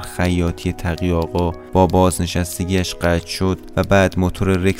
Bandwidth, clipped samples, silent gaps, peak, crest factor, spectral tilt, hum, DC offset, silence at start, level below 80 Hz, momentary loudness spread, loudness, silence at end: 16 kHz; under 0.1%; none; 0 dBFS; 16 dB; -6 dB/octave; none; under 0.1%; 0 s; -34 dBFS; 7 LU; -18 LUFS; 0 s